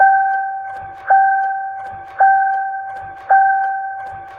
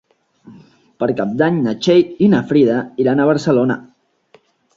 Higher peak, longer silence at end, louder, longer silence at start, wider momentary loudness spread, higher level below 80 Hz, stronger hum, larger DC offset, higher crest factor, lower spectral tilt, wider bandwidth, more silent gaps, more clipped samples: about the same, -2 dBFS vs -2 dBFS; second, 0 s vs 0.9 s; about the same, -16 LUFS vs -15 LUFS; second, 0 s vs 0.45 s; first, 16 LU vs 7 LU; about the same, -60 dBFS vs -58 dBFS; neither; neither; about the same, 14 dB vs 14 dB; second, -5 dB/octave vs -7 dB/octave; second, 3.3 kHz vs 7.8 kHz; neither; neither